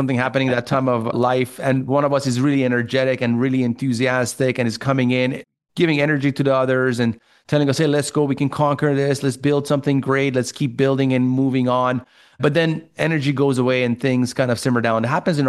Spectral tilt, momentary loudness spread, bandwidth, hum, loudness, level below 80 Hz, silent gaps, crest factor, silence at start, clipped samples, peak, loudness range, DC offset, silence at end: -6 dB/octave; 4 LU; 12.5 kHz; none; -19 LUFS; -60 dBFS; none; 14 dB; 0 s; under 0.1%; -4 dBFS; 1 LU; under 0.1%; 0 s